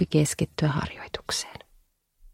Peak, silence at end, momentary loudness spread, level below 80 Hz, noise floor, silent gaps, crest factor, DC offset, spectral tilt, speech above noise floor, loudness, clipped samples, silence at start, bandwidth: -8 dBFS; 0.05 s; 14 LU; -50 dBFS; -63 dBFS; none; 20 dB; under 0.1%; -5 dB/octave; 36 dB; -28 LUFS; under 0.1%; 0 s; 16 kHz